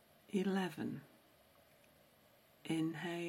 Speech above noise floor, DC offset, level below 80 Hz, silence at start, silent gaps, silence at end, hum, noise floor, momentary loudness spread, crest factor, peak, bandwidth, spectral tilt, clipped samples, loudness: 29 dB; under 0.1%; -82 dBFS; 0.3 s; none; 0 s; none; -68 dBFS; 11 LU; 18 dB; -26 dBFS; 16 kHz; -6 dB/octave; under 0.1%; -41 LUFS